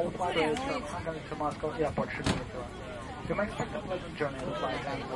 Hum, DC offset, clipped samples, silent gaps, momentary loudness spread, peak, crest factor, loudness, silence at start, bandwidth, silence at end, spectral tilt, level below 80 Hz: none; under 0.1%; under 0.1%; none; 10 LU; -16 dBFS; 18 dB; -34 LUFS; 0 s; 11.5 kHz; 0 s; -5.5 dB/octave; -50 dBFS